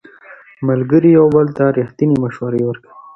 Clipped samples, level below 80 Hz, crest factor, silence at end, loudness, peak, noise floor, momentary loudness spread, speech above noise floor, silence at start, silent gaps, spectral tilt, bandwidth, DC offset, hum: under 0.1%; -52 dBFS; 14 dB; 0.15 s; -14 LUFS; 0 dBFS; -41 dBFS; 11 LU; 28 dB; 0.3 s; none; -10.5 dB/octave; 6 kHz; under 0.1%; none